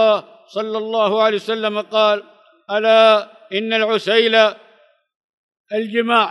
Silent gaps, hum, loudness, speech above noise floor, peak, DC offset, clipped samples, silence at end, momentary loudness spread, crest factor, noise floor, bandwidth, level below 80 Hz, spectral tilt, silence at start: 5.16-5.49 s, 5.57-5.65 s; none; -17 LUFS; 38 dB; -2 dBFS; under 0.1%; under 0.1%; 0 s; 12 LU; 16 dB; -54 dBFS; 10.5 kHz; -80 dBFS; -4 dB/octave; 0 s